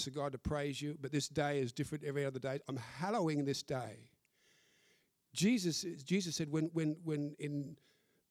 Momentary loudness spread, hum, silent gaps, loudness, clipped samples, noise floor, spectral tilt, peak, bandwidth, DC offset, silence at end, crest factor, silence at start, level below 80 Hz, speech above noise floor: 8 LU; none; none; -38 LUFS; under 0.1%; -74 dBFS; -5 dB/octave; -22 dBFS; 15.5 kHz; under 0.1%; 0.55 s; 16 dB; 0 s; -64 dBFS; 36 dB